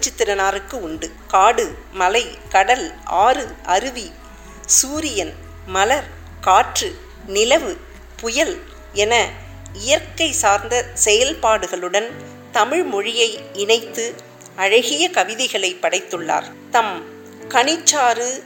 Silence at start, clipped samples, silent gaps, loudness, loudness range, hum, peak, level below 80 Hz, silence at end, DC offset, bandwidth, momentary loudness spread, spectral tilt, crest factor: 0 s; under 0.1%; none; -18 LUFS; 2 LU; none; 0 dBFS; -42 dBFS; 0 s; under 0.1%; 17 kHz; 15 LU; -1 dB/octave; 20 dB